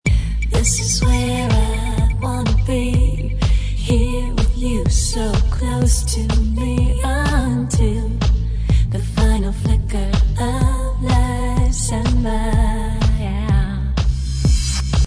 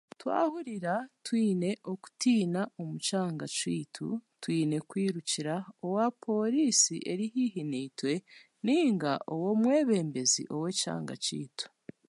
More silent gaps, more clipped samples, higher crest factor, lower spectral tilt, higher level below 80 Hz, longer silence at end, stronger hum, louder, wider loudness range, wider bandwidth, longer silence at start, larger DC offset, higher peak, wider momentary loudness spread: neither; neither; second, 12 dB vs 20 dB; first, -5.5 dB/octave vs -4 dB/octave; first, -18 dBFS vs -82 dBFS; second, 0 s vs 0.4 s; neither; first, -19 LUFS vs -31 LUFS; about the same, 1 LU vs 3 LU; about the same, 11 kHz vs 11.5 kHz; second, 0.05 s vs 0.2 s; neither; first, -4 dBFS vs -12 dBFS; second, 3 LU vs 10 LU